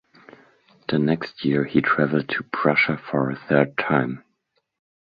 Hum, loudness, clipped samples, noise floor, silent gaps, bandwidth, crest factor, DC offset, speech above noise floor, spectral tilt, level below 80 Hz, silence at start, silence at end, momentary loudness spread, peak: none; -22 LUFS; under 0.1%; -72 dBFS; none; 5 kHz; 20 dB; under 0.1%; 51 dB; -9 dB/octave; -60 dBFS; 0.9 s; 0.9 s; 7 LU; -2 dBFS